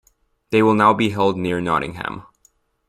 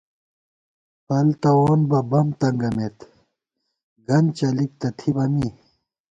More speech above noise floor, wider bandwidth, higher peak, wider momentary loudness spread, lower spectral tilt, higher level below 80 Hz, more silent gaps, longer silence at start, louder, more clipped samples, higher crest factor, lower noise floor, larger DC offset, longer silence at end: second, 42 dB vs 59 dB; first, 14 kHz vs 7.8 kHz; first, -2 dBFS vs -6 dBFS; first, 15 LU vs 9 LU; second, -6.5 dB/octave vs -8.5 dB/octave; about the same, -52 dBFS vs -54 dBFS; second, none vs 3.83-3.96 s; second, 0.5 s vs 1.1 s; first, -18 LUFS vs -21 LUFS; neither; about the same, 18 dB vs 16 dB; second, -60 dBFS vs -78 dBFS; neither; about the same, 0.65 s vs 0.6 s